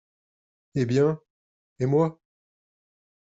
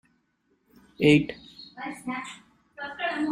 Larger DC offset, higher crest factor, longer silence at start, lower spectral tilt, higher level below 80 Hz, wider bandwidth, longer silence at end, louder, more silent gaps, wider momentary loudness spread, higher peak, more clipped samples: neither; about the same, 18 dB vs 22 dB; second, 0.75 s vs 1 s; first, -8 dB/octave vs -6 dB/octave; second, -66 dBFS vs -60 dBFS; second, 7.8 kHz vs 11.5 kHz; first, 1.25 s vs 0 s; about the same, -25 LUFS vs -26 LUFS; first, 1.30-1.76 s vs none; second, 10 LU vs 23 LU; second, -12 dBFS vs -6 dBFS; neither